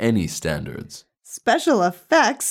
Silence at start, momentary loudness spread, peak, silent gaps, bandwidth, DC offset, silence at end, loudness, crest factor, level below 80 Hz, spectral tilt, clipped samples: 0 s; 20 LU; -4 dBFS; none; 17.5 kHz; under 0.1%; 0 s; -20 LUFS; 16 dB; -48 dBFS; -4 dB/octave; under 0.1%